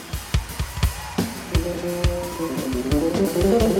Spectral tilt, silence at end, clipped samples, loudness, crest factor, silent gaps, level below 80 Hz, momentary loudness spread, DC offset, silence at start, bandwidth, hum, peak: -5.5 dB/octave; 0 s; under 0.1%; -24 LUFS; 16 dB; none; -30 dBFS; 7 LU; under 0.1%; 0 s; 17 kHz; none; -6 dBFS